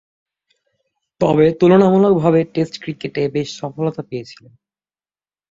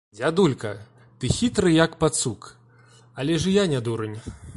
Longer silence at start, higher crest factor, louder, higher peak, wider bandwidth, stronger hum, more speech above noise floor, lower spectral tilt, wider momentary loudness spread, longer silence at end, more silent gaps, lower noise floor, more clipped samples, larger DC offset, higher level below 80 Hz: first, 1.2 s vs 0.15 s; about the same, 16 dB vs 20 dB; first, -16 LUFS vs -23 LUFS; about the same, -2 dBFS vs -4 dBFS; second, 7.8 kHz vs 11.5 kHz; first, 50 Hz at -40 dBFS vs none; first, over 74 dB vs 30 dB; first, -7.5 dB/octave vs -5 dB/octave; about the same, 15 LU vs 16 LU; first, 1.15 s vs 0 s; neither; first, under -90 dBFS vs -53 dBFS; neither; neither; second, -54 dBFS vs -46 dBFS